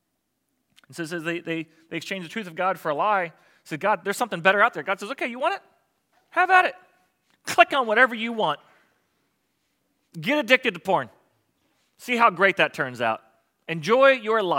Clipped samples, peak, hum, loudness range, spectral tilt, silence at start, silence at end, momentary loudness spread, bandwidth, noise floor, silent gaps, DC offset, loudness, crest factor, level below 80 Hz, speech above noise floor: under 0.1%; 0 dBFS; none; 5 LU; -4 dB/octave; 0.9 s; 0 s; 16 LU; 17 kHz; -76 dBFS; none; under 0.1%; -22 LUFS; 24 dB; -82 dBFS; 53 dB